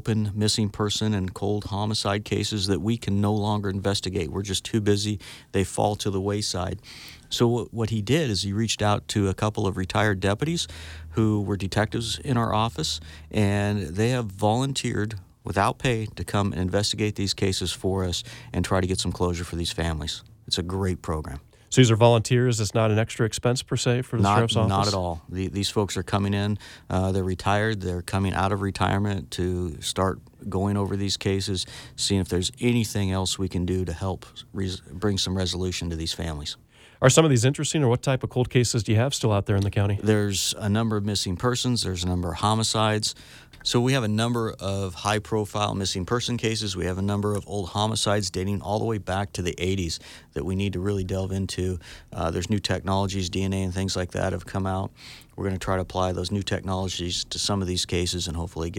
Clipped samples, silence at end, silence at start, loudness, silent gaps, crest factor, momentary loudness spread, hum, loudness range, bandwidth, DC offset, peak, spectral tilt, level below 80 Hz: under 0.1%; 0 s; 0.05 s; -25 LUFS; none; 20 dB; 8 LU; none; 5 LU; 16.5 kHz; under 0.1%; -4 dBFS; -5 dB/octave; -46 dBFS